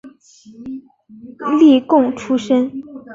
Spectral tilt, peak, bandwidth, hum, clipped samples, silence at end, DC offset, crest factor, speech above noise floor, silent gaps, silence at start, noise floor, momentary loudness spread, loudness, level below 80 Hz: -5.5 dB/octave; -2 dBFS; 7.6 kHz; none; under 0.1%; 0 s; under 0.1%; 14 dB; 26 dB; none; 0.05 s; -41 dBFS; 21 LU; -15 LUFS; -60 dBFS